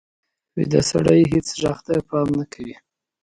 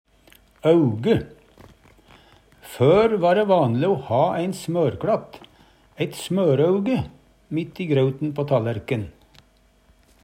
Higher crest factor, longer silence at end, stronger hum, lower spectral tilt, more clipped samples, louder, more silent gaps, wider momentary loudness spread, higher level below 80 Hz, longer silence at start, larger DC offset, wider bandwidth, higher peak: about the same, 20 dB vs 18 dB; second, 0.5 s vs 1.15 s; neither; second, -6 dB/octave vs -7.5 dB/octave; neither; about the same, -20 LUFS vs -21 LUFS; neither; first, 17 LU vs 11 LU; first, -46 dBFS vs -54 dBFS; about the same, 0.55 s vs 0.65 s; neither; second, 11.5 kHz vs 16 kHz; about the same, -2 dBFS vs -4 dBFS